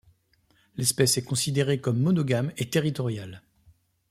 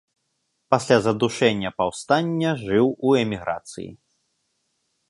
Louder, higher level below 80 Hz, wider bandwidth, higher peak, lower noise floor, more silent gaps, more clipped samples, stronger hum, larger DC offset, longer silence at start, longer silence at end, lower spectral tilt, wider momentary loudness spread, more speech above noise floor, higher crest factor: second, -25 LUFS vs -22 LUFS; about the same, -60 dBFS vs -56 dBFS; first, 16 kHz vs 11.5 kHz; second, -8 dBFS vs -2 dBFS; second, -66 dBFS vs -74 dBFS; neither; neither; neither; neither; about the same, 0.75 s vs 0.7 s; second, 0.7 s vs 1.15 s; about the same, -4.5 dB/octave vs -5.5 dB/octave; about the same, 10 LU vs 12 LU; second, 40 dB vs 52 dB; about the same, 20 dB vs 22 dB